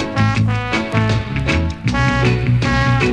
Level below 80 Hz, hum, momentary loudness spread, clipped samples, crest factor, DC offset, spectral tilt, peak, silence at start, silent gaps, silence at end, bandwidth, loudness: -28 dBFS; none; 3 LU; under 0.1%; 14 dB; under 0.1%; -6.5 dB/octave; -2 dBFS; 0 s; none; 0 s; 9.6 kHz; -17 LUFS